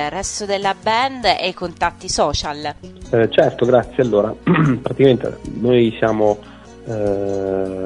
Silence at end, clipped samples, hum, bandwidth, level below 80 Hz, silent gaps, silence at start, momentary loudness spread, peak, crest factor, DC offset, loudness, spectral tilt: 0 s; under 0.1%; none; 11 kHz; -42 dBFS; none; 0 s; 10 LU; 0 dBFS; 18 dB; under 0.1%; -18 LUFS; -5 dB/octave